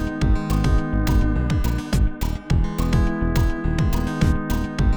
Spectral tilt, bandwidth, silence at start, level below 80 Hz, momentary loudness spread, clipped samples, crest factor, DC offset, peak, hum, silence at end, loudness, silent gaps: -7 dB/octave; over 20 kHz; 0 s; -22 dBFS; 2 LU; under 0.1%; 14 dB; 0.7%; -6 dBFS; none; 0 s; -22 LUFS; none